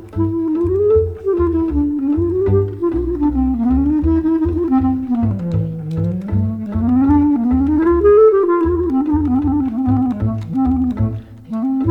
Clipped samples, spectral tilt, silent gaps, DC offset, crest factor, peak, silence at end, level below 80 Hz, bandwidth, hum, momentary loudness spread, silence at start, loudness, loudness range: under 0.1%; -11.5 dB/octave; none; under 0.1%; 14 dB; -2 dBFS; 0 s; -30 dBFS; 4.3 kHz; none; 8 LU; 0 s; -16 LUFS; 4 LU